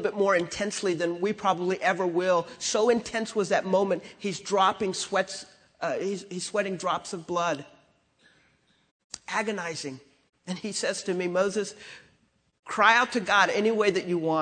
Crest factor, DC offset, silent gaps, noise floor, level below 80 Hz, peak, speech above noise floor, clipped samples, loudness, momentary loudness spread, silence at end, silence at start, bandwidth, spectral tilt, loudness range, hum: 22 dB; under 0.1%; 8.91-9.10 s, 12.59-12.63 s; -67 dBFS; -68 dBFS; -6 dBFS; 41 dB; under 0.1%; -27 LUFS; 13 LU; 0 s; 0 s; 9.4 kHz; -3.5 dB/octave; 8 LU; none